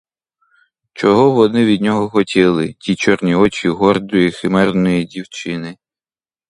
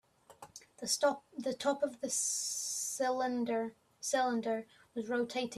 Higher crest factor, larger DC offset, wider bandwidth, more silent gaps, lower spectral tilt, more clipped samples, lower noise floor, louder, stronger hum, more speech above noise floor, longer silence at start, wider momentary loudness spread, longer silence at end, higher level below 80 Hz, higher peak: about the same, 16 dB vs 18 dB; neither; second, 11 kHz vs 15 kHz; neither; first, -6.5 dB/octave vs -2 dB/octave; neither; first, under -90 dBFS vs -58 dBFS; first, -15 LUFS vs -35 LUFS; neither; first, over 76 dB vs 23 dB; first, 0.95 s vs 0.3 s; about the same, 12 LU vs 12 LU; first, 0.75 s vs 0 s; first, -48 dBFS vs -80 dBFS; first, 0 dBFS vs -18 dBFS